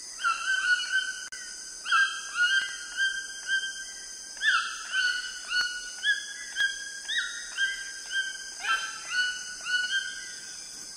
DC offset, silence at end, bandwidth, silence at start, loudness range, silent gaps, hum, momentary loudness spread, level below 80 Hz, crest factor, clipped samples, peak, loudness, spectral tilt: under 0.1%; 0 s; 16 kHz; 0 s; 3 LU; none; none; 12 LU; -68 dBFS; 18 dB; under 0.1%; -12 dBFS; -29 LUFS; 3.5 dB/octave